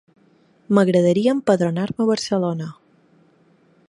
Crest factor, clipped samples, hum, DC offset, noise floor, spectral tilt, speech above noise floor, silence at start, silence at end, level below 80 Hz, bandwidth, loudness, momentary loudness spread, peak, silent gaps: 20 dB; under 0.1%; none; under 0.1%; -57 dBFS; -6.5 dB/octave; 38 dB; 0.7 s; 1.15 s; -64 dBFS; 11.5 kHz; -19 LUFS; 8 LU; -2 dBFS; none